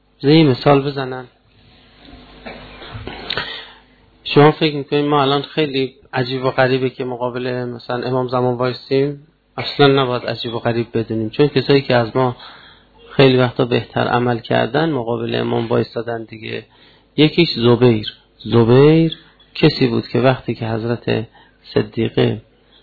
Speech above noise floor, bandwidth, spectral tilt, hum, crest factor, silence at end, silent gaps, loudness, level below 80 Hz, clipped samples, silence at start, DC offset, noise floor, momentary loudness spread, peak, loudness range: 34 dB; 4.8 kHz; -9 dB/octave; none; 18 dB; 0.4 s; none; -17 LUFS; -48 dBFS; under 0.1%; 0.2 s; under 0.1%; -50 dBFS; 18 LU; 0 dBFS; 5 LU